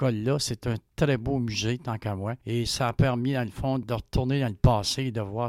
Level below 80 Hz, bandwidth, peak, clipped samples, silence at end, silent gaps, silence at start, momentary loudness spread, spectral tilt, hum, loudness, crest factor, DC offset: -40 dBFS; 15 kHz; -10 dBFS; under 0.1%; 0 s; none; 0 s; 8 LU; -5.5 dB/octave; none; -27 LUFS; 18 dB; under 0.1%